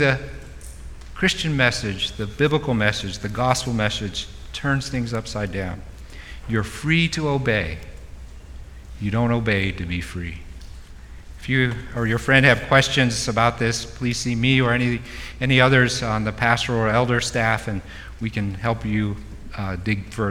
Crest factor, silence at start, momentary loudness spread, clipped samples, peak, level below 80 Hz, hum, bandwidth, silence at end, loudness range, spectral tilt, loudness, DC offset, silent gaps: 22 dB; 0 s; 21 LU; under 0.1%; -2 dBFS; -38 dBFS; none; 14.5 kHz; 0 s; 6 LU; -5 dB/octave; -21 LUFS; under 0.1%; none